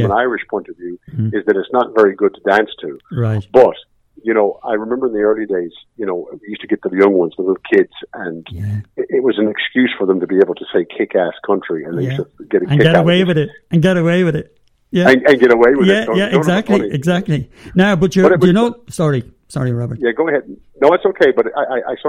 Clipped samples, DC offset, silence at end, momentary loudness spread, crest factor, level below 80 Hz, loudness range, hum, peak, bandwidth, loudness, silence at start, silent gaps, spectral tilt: 0.2%; under 0.1%; 0 s; 13 LU; 14 dB; -48 dBFS; 5 LU; none; 0 dBFS; 12 kHz; -15 LUFS; 0 s; none; -7 dB/octave